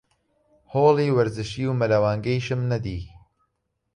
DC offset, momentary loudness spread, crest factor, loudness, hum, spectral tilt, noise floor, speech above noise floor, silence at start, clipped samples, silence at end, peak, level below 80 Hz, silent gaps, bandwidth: under 0.1%; 12 LU; 18 dB; -23 LUFS; none; -7.5 dB/octave; -75 dBFS; 54 dB; 0.7 s; under 0.1%; 0.9 s; -6 dBFS; -48 dBFS; none; 10.5 kHz